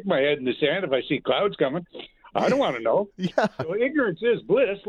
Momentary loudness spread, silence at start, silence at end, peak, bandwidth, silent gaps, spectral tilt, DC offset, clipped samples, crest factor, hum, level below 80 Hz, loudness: 5 LU; 0 s; 0 s; -8 dBFS; 9.6 kHz; none; -6 dB/octave; under 0.1%; under 0.1%; 16 dB; none; -62 dBFS; -24 LUFS